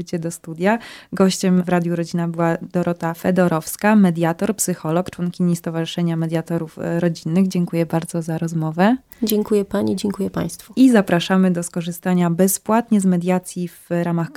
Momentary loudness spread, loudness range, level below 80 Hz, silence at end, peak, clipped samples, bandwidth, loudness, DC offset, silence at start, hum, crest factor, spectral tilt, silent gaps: 8 LU; 4 LU; -56 dBFS; 0.05 s; 0 dBFS; under 0.1%; 16.5 kHz; -19 LUFS; under 0.1%; 0 s; none; 18 dB; -6 dB/octave; none